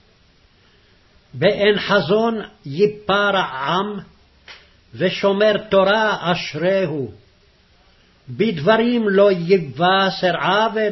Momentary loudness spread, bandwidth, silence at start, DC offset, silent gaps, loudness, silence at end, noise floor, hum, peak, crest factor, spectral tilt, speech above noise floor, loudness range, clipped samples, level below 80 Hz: 8 LU; 6.2 kHz; 1.35 s; under 0.1%; none; -18 LUFS; 0 s; -54 dBFS; none; -2 dBFS; 16 dB; -6 dB/octave; 37 dB; 3 LU; under 0.1%; -54 dBFS